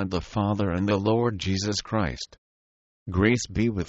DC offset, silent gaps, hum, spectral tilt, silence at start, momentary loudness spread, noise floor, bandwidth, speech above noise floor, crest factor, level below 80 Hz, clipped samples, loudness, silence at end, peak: under 0.1%; 2.38-3.06 s; none; -5.5 dB/octave; 0 s; 8 LU; under -90 dBFS; 8.2 kHz; over 65 dB; 18 dB; -44 dBFS; under 0.1%; -25 LUFS; 0 s; -8 dBFS